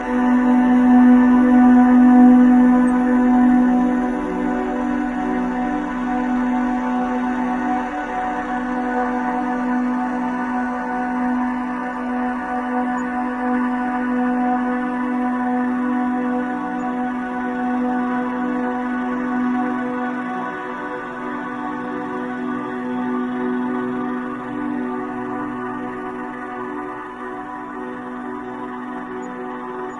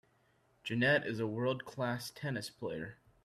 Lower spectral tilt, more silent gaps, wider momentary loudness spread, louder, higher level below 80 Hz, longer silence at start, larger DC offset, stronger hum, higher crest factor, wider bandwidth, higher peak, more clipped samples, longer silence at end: first, -7 dB/octave vs -5.5 dB/octave; neither; first, 16 LU vs 13 LU; first, -20 LUFS vs -36 LUFS; first, -46 dBFS vs -72 dBFS; second, 0 s vs 0.65 s; neither; neither; about the same, 16 dB vs 20 dB; second, 7 kHz vs 14.5 kHz; first, -2 dBFS vs -18 dBFS; neither; second, 0 s vs 0.3 s